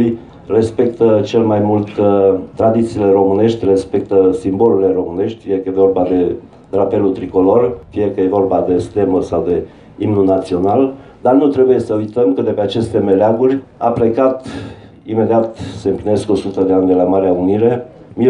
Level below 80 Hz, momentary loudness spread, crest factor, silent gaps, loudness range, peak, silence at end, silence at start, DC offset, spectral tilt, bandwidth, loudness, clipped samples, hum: -48 dBFS; 8 LU; 14 dB; none; 2 LU; 0 dBFS; 0 s; 0 s; under 0.1%; -8.5 dB/octave; 10.5 kHz; -14 LUFS; under 0.1%; none